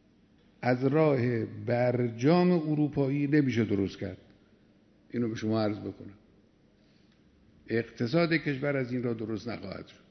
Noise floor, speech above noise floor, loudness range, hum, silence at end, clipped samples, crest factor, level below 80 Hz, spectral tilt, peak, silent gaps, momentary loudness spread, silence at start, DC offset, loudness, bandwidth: -63 dBFS; 35 dB; 9 LU; none; 0.2 s; under 0.1%; 20 dB; -66 dBFS; -8 dB/octave; -10 dBFS; none; 15 LU; 0.6 s; under 0.1%; -29 LUFS; 6.4 kHz